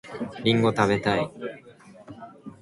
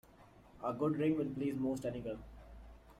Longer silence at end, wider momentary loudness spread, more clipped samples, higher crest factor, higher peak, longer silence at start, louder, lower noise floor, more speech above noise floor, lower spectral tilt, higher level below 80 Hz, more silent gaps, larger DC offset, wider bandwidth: about the same, 0.1 s vs 0.05 s; about the same, 22 LU vs 22 LU; neither; first, 22 dB vs 16 dB; first, -4 dBFS vs -22 dBFS; second, 0.05 s vs 0.2 s; first, -24 LUFS vs -38 LUFS; second, -49 dBFS vs -61 dBFS; about the same, 27 dB vs 25 dB; second, -6 dB/octave vs -8 dB/octave; about the same, -58 dBFS vs -60 dBFS; neither; neither; second, 11.5 kHz vs 14.5 kHz